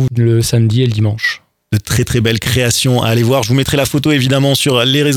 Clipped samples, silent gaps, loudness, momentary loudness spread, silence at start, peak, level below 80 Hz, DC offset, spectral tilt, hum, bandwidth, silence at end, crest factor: under 0.1%; none; -13 LUFS; 5 LU; 0 s; 0 dBFS; -36 dBFS; under 0.1%; -5 dB/octave; none; 18 kHz; 0 s; 12 dB